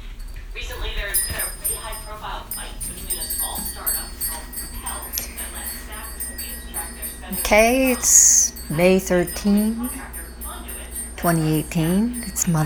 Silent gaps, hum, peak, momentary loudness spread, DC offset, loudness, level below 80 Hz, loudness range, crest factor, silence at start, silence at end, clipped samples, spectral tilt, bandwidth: none; none; 0 dBFS; 17 LU; under 0.1%; -20 LUFS; -36 dBFS; 11 LU; 22 dB; 0 s; 0 s; under 0.1%; -3.5 dB/octave; over 20 kHz